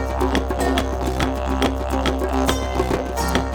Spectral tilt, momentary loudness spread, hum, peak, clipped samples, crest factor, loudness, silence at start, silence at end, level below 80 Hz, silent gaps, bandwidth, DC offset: -5 dB/octave; 2 LU; none; -2 dBFS; under 0.1%; 18 dB; -22 LUFS; 0 s; 0 s; -26 dBFS; none; 18.5 kHz; under 0.1%